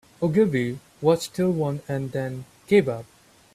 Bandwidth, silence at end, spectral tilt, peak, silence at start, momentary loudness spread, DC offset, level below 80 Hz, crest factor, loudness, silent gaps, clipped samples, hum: 15 kHz; 0.5 s; -7 dB/octave; -6 dBFS; 0.2 s; 10 LU; under 0.1%; -60 dBFS; 18 dB; -24 LUFS; none; under 0.1%; none